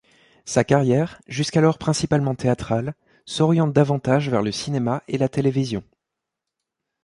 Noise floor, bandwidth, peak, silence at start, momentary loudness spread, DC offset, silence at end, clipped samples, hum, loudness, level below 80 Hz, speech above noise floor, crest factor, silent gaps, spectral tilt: -84 dBFS; 11.5 kHz; -2 dBFS; 0.45 s; 9 LU; under 0.1%; 1.25 s; under 0.1%; none; -21 LUFS; -52 dBFS; 63 dB; 18 dB; none; -6 dB/octave